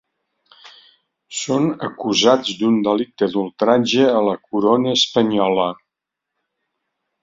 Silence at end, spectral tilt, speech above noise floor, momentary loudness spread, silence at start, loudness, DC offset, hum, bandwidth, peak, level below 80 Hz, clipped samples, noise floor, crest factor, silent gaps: 1.5 s; -4.5 dB/octave; 65 dB; 7 LU; 0.65 s; -18 LUFS; under 0.1%; none; 7.8 kHz; -2 dBFS; -62 dBFS; under 0.1%; -82 dBFS; 18 dB; none